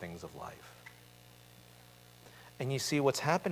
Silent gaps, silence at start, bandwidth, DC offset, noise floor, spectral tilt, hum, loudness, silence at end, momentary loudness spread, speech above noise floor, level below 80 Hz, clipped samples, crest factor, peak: none; 0 s; 16 kHz; under 0.1%; -58 dBFS; -4.5 dB/octave; 60 Hz at -60 dBFS; -34 LUFS; 0 s; 26 LU; 24 dB; -68 dBFS; under 0.1%; 22 dB; -14 dBFS